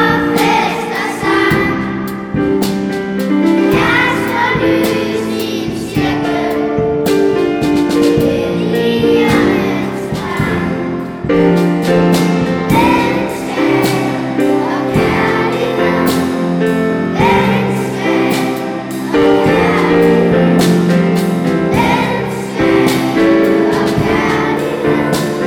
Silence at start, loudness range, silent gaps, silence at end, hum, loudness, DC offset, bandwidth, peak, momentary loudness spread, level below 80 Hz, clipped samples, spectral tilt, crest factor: 0 s; 2 LU; none; 0 s; none; -13 LUFS; under 0.1%; 19 kHz; 0 dBFS; 7 LU; -38 dBFS; under 0.1%; -6 dB/octave; 12 dB